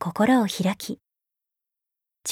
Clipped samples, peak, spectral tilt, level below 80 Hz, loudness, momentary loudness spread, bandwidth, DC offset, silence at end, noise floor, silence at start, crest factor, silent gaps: under 0.1%; -8 dBFS; -5 dB/octave; -68 dBFS; -23 LUFS; 15 LU; 16.5 kHz; under 0.1%; 0 s; -84 dBFS; 0 s; 18 dB; none